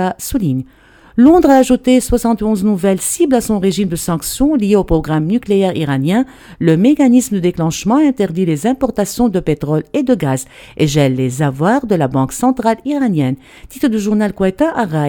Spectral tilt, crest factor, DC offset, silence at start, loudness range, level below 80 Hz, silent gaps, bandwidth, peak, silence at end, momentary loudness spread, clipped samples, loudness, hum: -6 dB/octave; 14 dB; under 0.1%; 0 s; 3 LU; -34 dBFS; none; 19 kHz; 0 dBFS; 0 s; 7 LU; under 0.1%; -14 LUFS; none